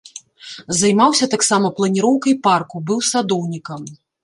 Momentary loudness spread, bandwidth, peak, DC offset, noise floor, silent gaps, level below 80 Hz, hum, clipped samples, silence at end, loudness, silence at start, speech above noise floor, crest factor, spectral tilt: 21 LU; 11.5 kHz; -2 dBFS; under 0.1%; -37 dBFS; none; -60 dBFS; none; under 0.1%; 0.3 s; -16 LUFS; 0.15 s; 21 dB; 16 dB; -4 dB/octave